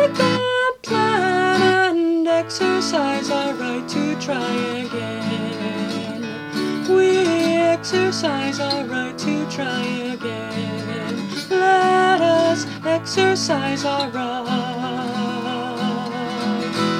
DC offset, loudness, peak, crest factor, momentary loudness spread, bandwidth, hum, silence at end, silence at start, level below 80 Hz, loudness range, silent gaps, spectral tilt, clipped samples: under 0.1%; -20 LUFS; -4 dBFS; 16 dB; 10 LU; 15 kHz; none; 0 s; 0 s; -62 dBFS; 5 LU; none; -4.5 dB/octave; under 0.1%